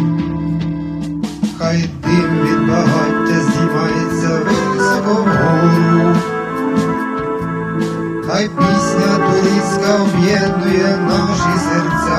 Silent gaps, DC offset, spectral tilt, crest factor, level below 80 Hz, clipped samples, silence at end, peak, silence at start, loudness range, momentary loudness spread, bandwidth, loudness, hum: none; under 0.1%; -6 dB/octave; 14 dB; -40 dBFS; under 0.1%; 0 s; 0 dBFS; 0 s; 2 LU; 7 LU; 14 kHz; -15 LUFS; none